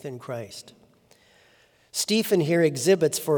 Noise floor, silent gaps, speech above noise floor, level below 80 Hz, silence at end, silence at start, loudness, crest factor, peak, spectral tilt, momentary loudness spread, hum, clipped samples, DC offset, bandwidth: -60 dBFS; none; 36 dB; -74 dBFS; 0 s; 0.05 s; -24 LUFS; 18 dB; -8 dBFS; -4.5 dB/octave; 15 LU; none; under 0.1%; under 0.1%; over 20 kHz